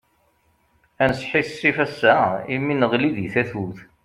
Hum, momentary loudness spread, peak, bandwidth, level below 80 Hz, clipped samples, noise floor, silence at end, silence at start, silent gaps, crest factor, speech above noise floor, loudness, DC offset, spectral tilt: none; 7 LU; -2 dBFS; 12.5 kHz; -54 dBFS; under 0.1%; -63 dBFS; 0.2 s; 1 s; none; 20 dB; 43 dB; -21 LUFS; under 0.1%; -6.5 dB/octave